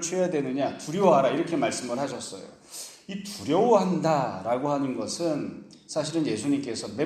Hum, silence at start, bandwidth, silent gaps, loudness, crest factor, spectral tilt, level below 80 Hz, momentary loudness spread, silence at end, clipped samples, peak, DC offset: none; 0 s; 14.5 kHz; none; -26 LUFS; 20 dB; -5 dB/octave; -68 dBFS; 17 LU; 0 s; under 0.1%; -6 dBFS; under 0.1%